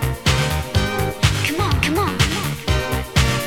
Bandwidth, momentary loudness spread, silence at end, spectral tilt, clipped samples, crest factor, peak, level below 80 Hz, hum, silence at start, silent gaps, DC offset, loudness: 18.5 kHz; 3 LU; 0 s; -4.5 dB/octave; under 0.1%; 18 dB; 0 dBFS; -28 dBFS; none; 0 s; none; under 0.1%; -19 LUFS